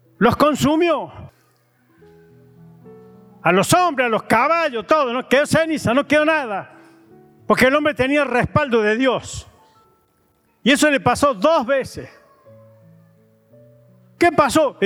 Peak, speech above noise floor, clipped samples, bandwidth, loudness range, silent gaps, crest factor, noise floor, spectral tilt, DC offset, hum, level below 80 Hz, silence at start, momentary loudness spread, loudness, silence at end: -4 dBFS; 44 dB; under 0.1%; 17.5 kHz; 5 LU; none; 16 dB; -61 dBFS; -4.5 dB/octave; under 0.1%; none; -50 dBFS; 0.2 s; 7 LU; -17 LUFS; 0 s